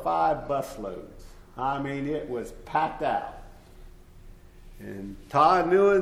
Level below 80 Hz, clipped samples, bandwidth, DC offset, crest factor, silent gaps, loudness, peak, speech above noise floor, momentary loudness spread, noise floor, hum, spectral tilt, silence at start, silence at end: -48 dBFS; under 0.1%; 15 kHz; under 0.1%; 20 dB; none; -26 LUFS; -8 dBFS; 22 dB; 21 LU; -48 dBFS; none; -6.5 dB/octave; 0 s; 0 s